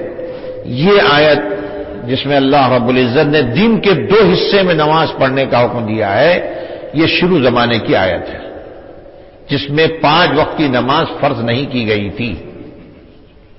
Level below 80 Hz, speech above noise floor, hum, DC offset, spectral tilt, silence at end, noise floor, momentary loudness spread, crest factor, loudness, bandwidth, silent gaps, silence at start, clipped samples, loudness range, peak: -40 dBFS; 29 dB; none; under 0.1%; -9.5 dB/octave; 0.6 s; -40 dBFS; 15 LU; 12 dB; -12 LUFS; 5.8 kHz; none; 0 s; under 0.1%; 4 LU; 0 dBFS